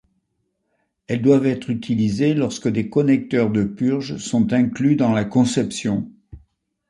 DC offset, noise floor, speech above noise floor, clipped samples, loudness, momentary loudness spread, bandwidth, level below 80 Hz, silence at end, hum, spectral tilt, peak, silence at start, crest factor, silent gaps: under 0.1%; -72 dBFS; 54 dB; under 0.1%; -20 LUFS; 7 LU; 11 kHz; -52 dBFS; 0.5 s; none; -6.5 dB/octave; -2 dBFS; 1.1 s; 18 dB; none